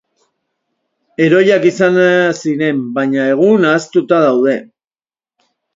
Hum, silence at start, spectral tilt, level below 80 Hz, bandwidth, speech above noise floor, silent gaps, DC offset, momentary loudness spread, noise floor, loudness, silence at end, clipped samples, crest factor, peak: none; 1.2 s; -6 dB/octave; -62 dBFS; 7.8 kHz; over 79 dB; none; under 0.1%; 6 LU; under -90 dBFS; -12 LUFS; 1.1 s; under 0.1%; 14 dB; 0 dBFS